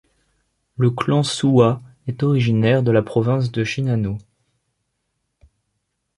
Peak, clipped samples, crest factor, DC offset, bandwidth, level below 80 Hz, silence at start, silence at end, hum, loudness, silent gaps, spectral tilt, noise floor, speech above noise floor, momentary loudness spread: -2 dBFS; under 0.1%; 18 dB; under 0.1%; 11.5 kHz; -52 dBFS; 0.8 s; 2 s; none; -19 LUFS; none; -7 dB/octave; -74 dBFS; 56 dB; 11 LU